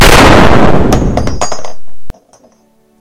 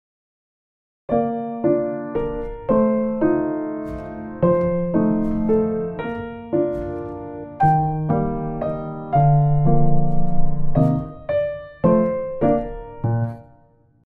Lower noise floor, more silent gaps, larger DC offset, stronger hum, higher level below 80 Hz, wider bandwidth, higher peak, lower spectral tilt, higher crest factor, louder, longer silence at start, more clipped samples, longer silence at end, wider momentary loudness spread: second, -49 dBFS vs -55 dBFS; neither; neither; neither; first, -16 dBFS vs -32 dBFS; first, over 20 kHz vs 3.8 kHz; first, 0 dBFS vs -4 dBFS; second, -4.5 dB/octave vs -11.5 dB/octave; second, 6 dB vs 16 dB; first, -8 LUFS vs -21 LUFS; second, 0 s vs 1.1 s; first, 4% vs under 0.1%; first, 0.9 s vs 0.65 s; first, 17 LU vs 11 LU